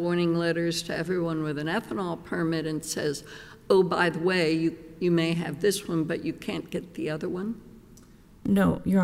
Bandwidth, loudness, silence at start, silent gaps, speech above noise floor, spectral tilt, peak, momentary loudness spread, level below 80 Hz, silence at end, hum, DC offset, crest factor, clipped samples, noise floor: 16 kHz; -27 LUFS; 0 s; none; 25 dB; -5.5 dB/octave; -8 dBFS; 10 LU; -54 dBFS; 0 s; none; under 0.1%; 18 dB; under 0.1%; -52 dBFS